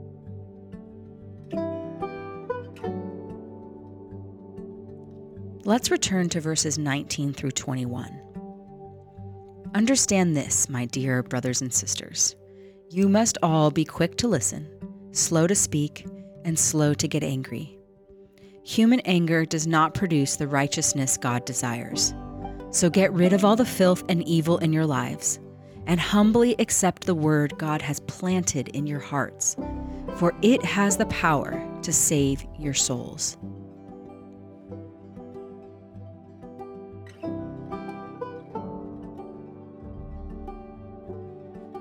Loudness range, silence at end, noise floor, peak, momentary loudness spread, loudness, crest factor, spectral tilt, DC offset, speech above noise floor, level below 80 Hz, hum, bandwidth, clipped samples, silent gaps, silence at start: 15 LU; 0 s; -52 dBFS; -6 dBFS; 23 LU; -24 LUFS; 20 dB; -4 dB/octave; under 0.1%; 29 dB; -50 dBFS; none; 18.5 kHz; under 0.1%; none; 0 s